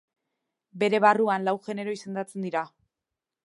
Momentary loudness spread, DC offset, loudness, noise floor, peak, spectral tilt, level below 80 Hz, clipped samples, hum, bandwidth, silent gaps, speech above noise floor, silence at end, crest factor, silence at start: 13 LU; under 0.1%; -26 LUFS; -88 dBFS; -6 dBFS; -5.5 dB/octave; -82 dBFS; under 0.1%; none; 11.5 kHz; none; 62 dB; 0.8 s; 22 dB; 0.75 s